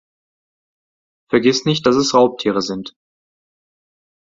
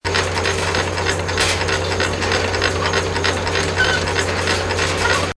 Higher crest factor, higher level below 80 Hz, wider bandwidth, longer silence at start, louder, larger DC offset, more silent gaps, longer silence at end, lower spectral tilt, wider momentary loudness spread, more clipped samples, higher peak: about the same, 18 dB vs 18 dB; second, -58 dBFS vs -36 dBFS; second, 7.8 kHz vs 11 kHz; first, 1.3 s vs 0.05 s; about the same, -16 LUFS vs -18 LUFS; neither; neither; first, 1.35 s vs 0.05 s; about the same, -4.5 dB/octave vs -3.5 dB/octave; first, 12 LU vs 2 LU; neither; about the same, -2 dBFS vs -2 dBFS